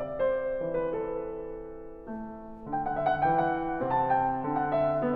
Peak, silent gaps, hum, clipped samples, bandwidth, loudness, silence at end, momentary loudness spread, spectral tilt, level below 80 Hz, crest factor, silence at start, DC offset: -16 dBFS; none; none; under 0.1%; 4.9 kHz; -29 LUFS; 0 s; 15 LU; -9.5 dB/octave; -52 dBFS; 14 dB; 0 s; under 0.1%